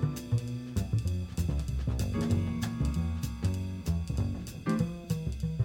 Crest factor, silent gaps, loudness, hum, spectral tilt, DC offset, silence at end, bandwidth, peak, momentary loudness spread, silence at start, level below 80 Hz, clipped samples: 16 dB; none; -33 LUFS; none; -7 dB/octave; under 0.1%; 0 s; 17 kHz; -16 dBFS; 4 LU; 0 s; -38 dBFS; under 0.1%